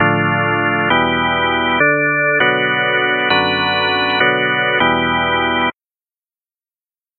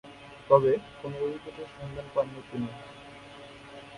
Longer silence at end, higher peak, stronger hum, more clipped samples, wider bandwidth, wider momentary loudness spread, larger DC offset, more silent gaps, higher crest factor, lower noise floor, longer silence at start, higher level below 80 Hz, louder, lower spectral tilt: first, 1.5 s vs 0 s; first, 0 dBFS vs -6 dBFS; neither; neither; second, 4.6 kHz vs 11 kHz; second, 2 LU vs 24 LU; neither; neither; second, 16 dB vs 26 dB; first, under -90 dBFS vs -47 dBFS; about the same, 0 s vs 0.05 s; first, -46 dBFS vs -60 dBFS; first, -14 LUFS vs -29 LUFS; first, -9 dB/octave vs -7.5 dB/octave